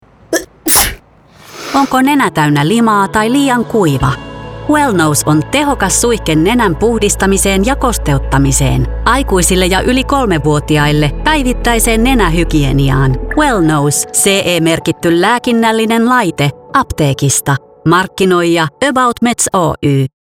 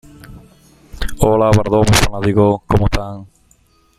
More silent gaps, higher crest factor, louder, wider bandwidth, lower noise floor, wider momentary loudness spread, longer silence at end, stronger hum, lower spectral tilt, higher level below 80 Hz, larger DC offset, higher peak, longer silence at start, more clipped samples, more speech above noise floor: neither; about the same, 12 dB vs 16 dB; first, -11 LUFS vs -14 LUFS; first, over 20 kHz vs 15.5 kHz; second, -41 dBFS vs -54 dBFS; second, 4 LU vs 17 LU; second, 0.15 s vs 0.75 s; neither; about the same, -4.5 dB/octave vs -5.5 dB/octave; about the same, -24 dBFS vs -26 dBFS; neither; about the same, 0 dBFS vs 0 dBFS; about the same, 0.3 s vs 0.3 s; neither; second, 31 dB vs 41 dB